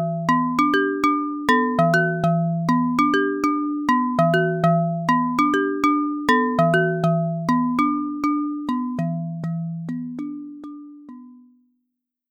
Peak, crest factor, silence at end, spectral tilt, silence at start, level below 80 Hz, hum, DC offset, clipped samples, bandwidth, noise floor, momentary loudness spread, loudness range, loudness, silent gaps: -4 dBFS; 16 dB; 0.95 s; -7 dB/octave; 0 s; -58 dBFS; none; under 0.1%; under 0.1%; 16.5 kHz; -78 dBFS; 11 LU; 9 LU; -21 LUFS; none